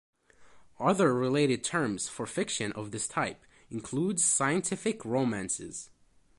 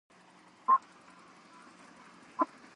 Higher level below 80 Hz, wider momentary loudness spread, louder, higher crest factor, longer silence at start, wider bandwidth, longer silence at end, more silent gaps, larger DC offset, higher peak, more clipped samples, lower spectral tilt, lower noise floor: first, -66 dBFS vs -88 dBFS; second, 10 LU vs 26 LU; about the same, -29 LUFS vs -31 LUFS; about the same, 18 dB vs 22 dB; second, 0.4 s vs 0.7 s; about the same, 11.5 kHz vs 10.5 kHz; first, 0.5 s vs 0.3 s; neither; neither; first, -12 dBFS vs -16 dBFS; neither; about the same, -4 dB/octave vs -4.5 dB/octave; about the same, -59 dBFS vs -59 dBFS